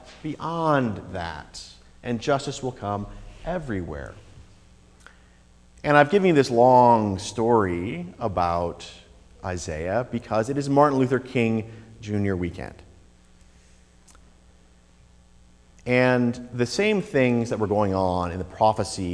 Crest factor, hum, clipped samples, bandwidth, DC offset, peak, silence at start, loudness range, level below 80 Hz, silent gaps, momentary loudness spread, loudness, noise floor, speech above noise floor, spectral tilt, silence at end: 22 dB; none; under 0.1%; 11 kHz; under 0.1%; -2 dBFS; 0.05 s; 12 LU; -48 dBFS; none; 19 LU; -23 LUFS; -54 dBFS; 31 dB; -6 dB/octave; 0 s